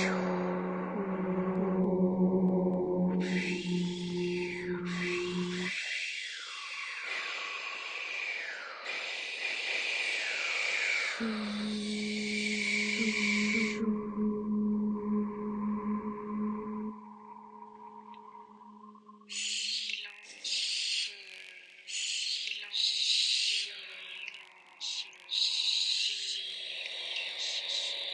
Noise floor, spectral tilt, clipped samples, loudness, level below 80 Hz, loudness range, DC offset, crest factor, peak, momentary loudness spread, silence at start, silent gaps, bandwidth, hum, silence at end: -54 dBFS; -3.5 dB/octave; under 0.1%; -32 LUFS; -68 dBFS; 7 LU; under 0.1%; 18 dB; -16 dBFS; 14 LU; 0 s; none; 9.8 kHz; none; 0 s